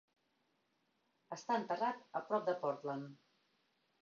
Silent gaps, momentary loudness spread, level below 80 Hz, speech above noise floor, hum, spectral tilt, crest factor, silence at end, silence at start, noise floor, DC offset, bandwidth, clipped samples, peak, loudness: none; 12 LU; under -90 dBFS; 41 dB; none; -4 dB/octave; 20 dB; 0.9 s; 1.3 s; -81 dBFS; under 0.1%; 7.2 kHz; under 0.1%; -24 dBFS; -40 LUFS